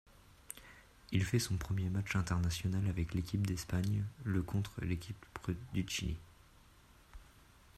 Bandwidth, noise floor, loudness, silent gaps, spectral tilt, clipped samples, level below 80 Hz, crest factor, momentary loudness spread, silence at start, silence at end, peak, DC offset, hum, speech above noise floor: 14 kHz; -63 dBFS; -38 LUFS; none; -5.5 dB/octave; under 0.1%; -54 dBFS; 18 dB; 14 LU; 0.5 s; 0.55 s; -20 dBFS; under 0.1%; none; 26 dB